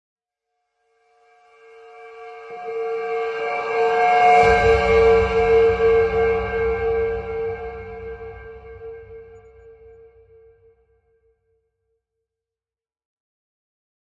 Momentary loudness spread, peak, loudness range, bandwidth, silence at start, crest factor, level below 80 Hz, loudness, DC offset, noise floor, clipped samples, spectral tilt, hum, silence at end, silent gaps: 24 LU; -2 dBFS; 18 LU; 8 kHz; 1.95 s; 20 dB; -40 dBFS; -18 LUFS; under 0.1%; under -90 dBFS; under 0.1%; -5.5 dB/octave; none; 4.75 s; none